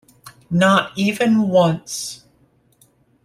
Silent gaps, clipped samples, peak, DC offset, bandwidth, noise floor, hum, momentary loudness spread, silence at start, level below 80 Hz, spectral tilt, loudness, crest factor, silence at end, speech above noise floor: none; under 0.1%; -2 dBFS; under 0.1%; 15.5 kHz; -58 dBFS; none; 13 LU; 0.25 s; -58 dBFS; -5 dB/octave; -17 LUFS; 18 dB; 1.1 s; 41 dB